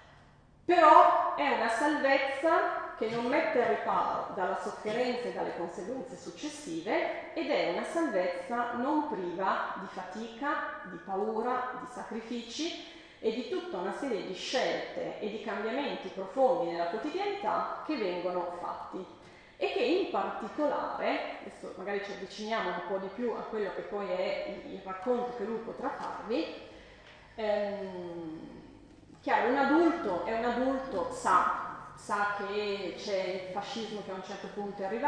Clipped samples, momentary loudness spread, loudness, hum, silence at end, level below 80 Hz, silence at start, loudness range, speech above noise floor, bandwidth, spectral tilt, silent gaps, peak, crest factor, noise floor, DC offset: under 0.1%; 13 LU; -32 LUFS; none; 0 s; -66 dBFS; 0 s; 7 LU; 27 dB; 10 kHz; -4.5 dB/octave; none; -6 dBFS; 26 dB; -59 dBFS; under 0.1%